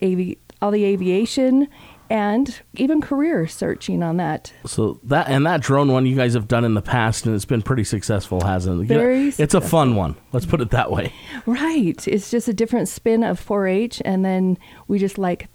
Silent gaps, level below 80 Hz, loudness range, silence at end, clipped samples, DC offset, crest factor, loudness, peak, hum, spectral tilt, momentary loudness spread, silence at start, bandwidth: none; -42 dBFS; 2 LU; 0.1 s; under 0.1%; under 0.1%; 16 dB; -20 LUFS; -2 dBFS; none; -6.5 dB/octave; 7 LU; 0 s; 19.5 kHz